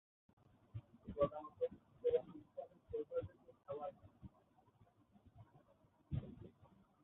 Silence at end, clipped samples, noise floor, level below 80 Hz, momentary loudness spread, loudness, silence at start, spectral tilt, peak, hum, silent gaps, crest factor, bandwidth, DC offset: 0.35 s; under 0.1%; -73 dBFS; -66 dBFS; 22 LU; -45 LUFS; 0.75 s; -7 dB/octave; -24 dBFS; none; none; 22 dB; 3.9 kHz; under 0.1%